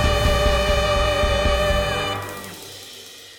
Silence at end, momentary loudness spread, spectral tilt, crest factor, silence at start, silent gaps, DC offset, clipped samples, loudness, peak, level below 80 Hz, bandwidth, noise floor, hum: 0 s; 17 LU; -4 dB/octave; 14 dB; 0 s; none; under 0.1%; under 0.1%; -20 LUFS; -6 dBFS; -26 dBFS; 18 kHz; -40 dBFS; none